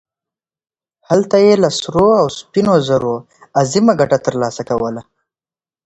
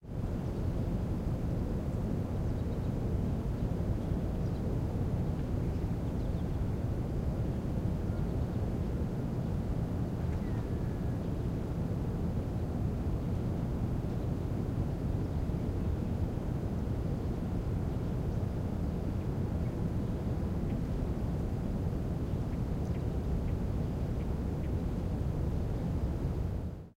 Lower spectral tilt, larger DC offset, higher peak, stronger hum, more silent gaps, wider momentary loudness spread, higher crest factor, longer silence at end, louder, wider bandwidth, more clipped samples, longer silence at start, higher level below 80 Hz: second, -5.5 dB/octave vs -9 dB/octave; neither; first, 0 dBFS vs -20 dBFS; neither; neither; first, 9 LU vs 1 LU; about the same, 16 dB vs 12 dB; first, 0.85 s vs 0.05 s; first, -14 LUFS vs -35 LUFS; second, 8.2 kHz vs 16 kHz; neither; first, 1.1 s vs 0 s; second, -48 dBFS vs -38 dBFS